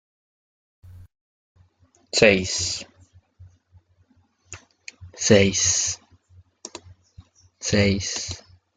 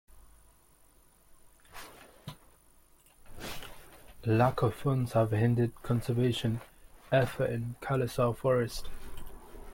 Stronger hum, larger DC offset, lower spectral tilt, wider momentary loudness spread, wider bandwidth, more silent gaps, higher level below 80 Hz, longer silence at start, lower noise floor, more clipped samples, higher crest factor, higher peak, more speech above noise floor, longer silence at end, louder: neither; neither; second, -3 dB/octave vs -7 dB/octave; first, 26 LU vs 22 LU; second, 10 kHz vs 16.5 kHz; first, 1.21-1.55 s vs none; about the same, -54 dBFS vs -52 dBFS; first, 0.85 s vs 0.15 s; about the same, -62 dBFS vs -62 dBFS; neither; first, 24 dB vs 18 dB; first, -2 dBFS vs -14 dBFS; first, 42 dB vs 33 dB; first, 0.4 s vs 0 s; first, -20 LUFS vs -31 LUFS